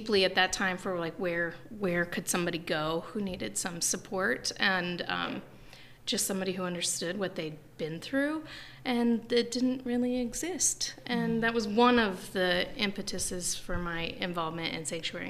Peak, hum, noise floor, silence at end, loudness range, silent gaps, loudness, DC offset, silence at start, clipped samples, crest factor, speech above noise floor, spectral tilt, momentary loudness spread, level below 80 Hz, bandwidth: -10 dBFS; none; -51 dBFS; 0 s; 4 LU; none; -31 LUFS; under 0.1%; 0 s; under 0.1%; 22 dB; 20 dB; -3 dB/octave; 8 LU; -52 dBFS; 15.5 kHz